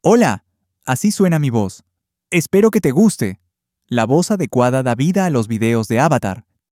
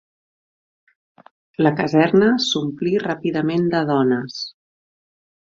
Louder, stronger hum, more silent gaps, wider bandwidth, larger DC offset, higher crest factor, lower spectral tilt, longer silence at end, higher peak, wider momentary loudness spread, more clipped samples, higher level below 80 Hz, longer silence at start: first, -16 LUFS vs -19 LUFS; neither; neither; first, 16 kHz vs 7.8 kHz; neither; about the same, 16 dB vs 18 dB; about the same, -6 dB/octave vs -6 dB/octave; second, 0.3 s vs 1.05 s; about the same, -2 dBFS vs -2 dBFS; second, 10 LU vs 13 LU; neither; first, -54 dBFS vs -60 dBFS; second, 0.05 s vs 1.6 s